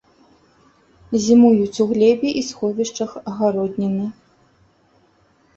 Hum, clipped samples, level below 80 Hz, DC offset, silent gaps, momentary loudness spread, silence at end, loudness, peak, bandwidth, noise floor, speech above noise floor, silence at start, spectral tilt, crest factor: none; under 0.1%; -58 dBFS; under 0.1%; none; 13 LU; 1.45 s; -18 LUFS; -2 dBFS; 7.8 kHz; -58 dBFS; 40 dB; 1.1 s; -6 dB/octave; 18 dB